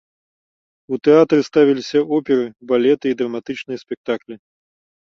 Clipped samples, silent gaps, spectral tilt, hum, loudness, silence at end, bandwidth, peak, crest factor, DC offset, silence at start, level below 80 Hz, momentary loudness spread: under 0.1%; 3.97-4.04 s; -6.5 dB/octave; none; -18 LUFS; 0.7 s; 7.2 kHz; -2 dBFS; 18 dB; under 0.1%; 0.9 s; -64 dBFS; 14 LU